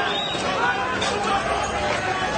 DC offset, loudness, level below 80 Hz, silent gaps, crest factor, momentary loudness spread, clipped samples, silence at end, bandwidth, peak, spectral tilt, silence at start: under 0.1%; -23 LUFS; -44 dBFS; none; 14 dB; 2 LU; under 0.1%; 0 s; 9.6 kHz; -10 dBFS; -3 dB/octave; 0 s